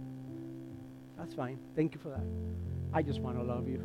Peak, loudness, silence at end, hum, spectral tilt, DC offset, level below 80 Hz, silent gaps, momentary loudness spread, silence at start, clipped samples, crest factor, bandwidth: -18 dBFS; -38 LUFS; 0 s; none; -8.5 dB/octave; under 0.1%; -54 dBFS; none; 13 LU; 0 s; under 0.1%; 18 dB; 12 kHz